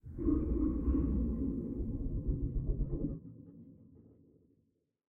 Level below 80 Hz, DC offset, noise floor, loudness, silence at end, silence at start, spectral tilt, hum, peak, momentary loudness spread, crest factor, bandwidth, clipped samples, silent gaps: -40 dBFS; under 0.1%; -77 dBFS; -36 LUFS; 1.2 s; 0.05 s; -13.5 dB/octave; none; -22 dBFS; 20 LU; 14 dB; 2.2 kHz; under 0.1%; none